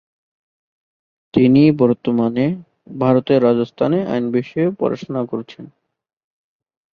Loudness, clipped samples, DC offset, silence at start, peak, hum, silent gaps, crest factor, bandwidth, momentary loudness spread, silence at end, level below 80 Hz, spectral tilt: -17 LUFS; under 0.1%; under 0.1%; 1.35 s; 0 dBFS; none; none; 18 dB; 6.4 kHz; 13 LU; 1.3 s; -56 dBFS; -9.5 dB/octave